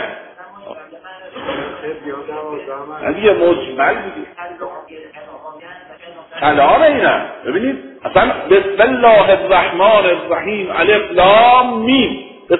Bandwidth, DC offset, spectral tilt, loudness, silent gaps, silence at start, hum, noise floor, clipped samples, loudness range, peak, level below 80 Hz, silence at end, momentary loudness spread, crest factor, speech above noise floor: 4.1 kHz; under 0.1%; -8 dB/octave; -12 LUFS; none; 0 s; none; -36 dBFS; under 0.1%; 9 LU; 0 dBFS; -44 dBFS; 0 s; 23 LU; 14 dB; 23 dB